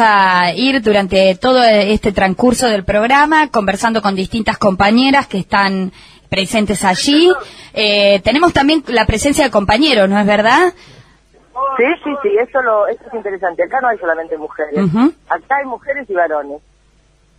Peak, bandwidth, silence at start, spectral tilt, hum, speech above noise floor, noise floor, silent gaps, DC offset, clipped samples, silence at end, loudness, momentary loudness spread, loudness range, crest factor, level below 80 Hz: 0 dBFS; 14.5 kHz; 0 s; -4.5 dB/octave; none; 39 dB; -52 dBFS; none; under 0.1%; under 0.1%; 0.8 s; -13 LUFS; 10 LU; 5 LU; 14 dB; -36 dBFS